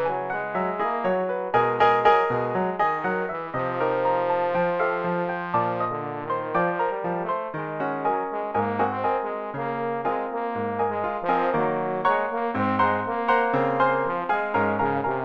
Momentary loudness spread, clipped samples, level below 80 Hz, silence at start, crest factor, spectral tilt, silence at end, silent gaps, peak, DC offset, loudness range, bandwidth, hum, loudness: 7 LU; under 0.1%; -60 dBFS; 0 s; 20 dB; -8 dB/octave; 0 s; none; -6 dBFS; 0.1%; 4 LU; 7 kHz; none; -24 LUFS